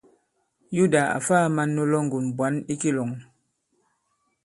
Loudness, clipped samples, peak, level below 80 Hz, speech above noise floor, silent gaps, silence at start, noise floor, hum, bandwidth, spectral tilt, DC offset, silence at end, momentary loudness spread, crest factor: -24 LUFS; under 0.1%; -6 dBFS; -66 dBFS; 50 dB; none; 0.7 s; -72 dBFS; none; 11.5 kHz; -6 dB/octave; under 0.1%; 1.2 s; 9 LU; 20 dB